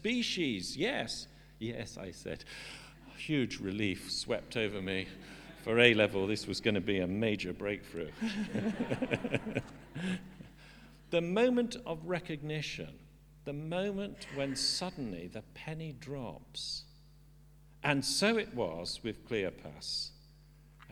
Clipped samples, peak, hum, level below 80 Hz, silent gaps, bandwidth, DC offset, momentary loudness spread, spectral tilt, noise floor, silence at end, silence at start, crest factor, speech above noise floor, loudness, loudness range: under 0.1%; -6 dBFS; none; -60 dBFS; none; 19.5 kHz; under 0.1%; 15 LU; -4.5 dB/octave; -59 dBFS; 0 s; 0 s; 30 dB; 24 dB; -35 LUFS; 7 LU